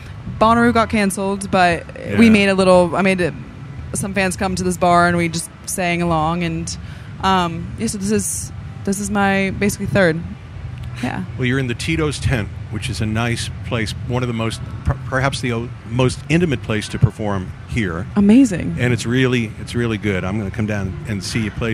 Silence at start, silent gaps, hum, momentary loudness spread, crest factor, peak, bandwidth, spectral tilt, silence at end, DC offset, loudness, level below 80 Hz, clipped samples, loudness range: 0 s; none; none; 12 LU; 18 dB; 0 dBFS; 15 kHz; -5.5 dB/octave; 0 s; under 0.1%; -18 LUFS; -36 dBFS; under 0.1%; 6 LU